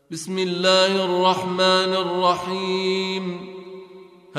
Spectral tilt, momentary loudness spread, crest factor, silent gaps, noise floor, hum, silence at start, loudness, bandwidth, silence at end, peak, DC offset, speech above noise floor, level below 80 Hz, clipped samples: -4 dB/octave; 18 LU; 18 dB; none; -45 dBFS; none; 0.1 s; -20 LUFS; 13 kHz; 0 s; -4 dBFS; under 0.1%; 24 dB; -66 dBFS; under 0.1%